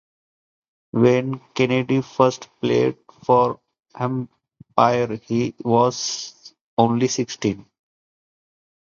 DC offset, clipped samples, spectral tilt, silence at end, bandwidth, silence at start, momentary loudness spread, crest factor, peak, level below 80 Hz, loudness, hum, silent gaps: under 0.1%; under 0.1%; -5.5 dB/octave; 1.2 s; 7.4 kHz; 0.95 s; 11 LU; 22 dB; 0 dBFS; -60 dBFS; -21 LUFS; none; 6.61-6.77 s